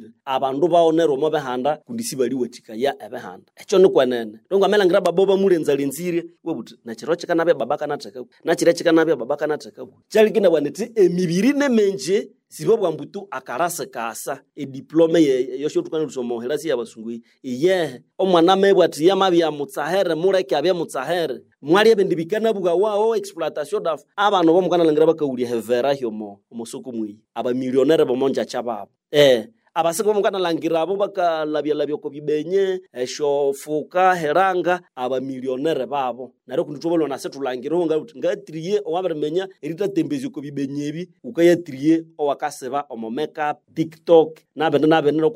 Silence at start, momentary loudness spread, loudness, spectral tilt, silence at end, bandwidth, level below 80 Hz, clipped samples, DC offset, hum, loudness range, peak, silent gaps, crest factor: 0 s; 14 LU; -20 LUFS; -5 dB/octave; 0 s; 16 kHz; -72 dBFS; under 0.1%; under 0.1%; none; 5 LU; -2 dBFS; none; 18 dB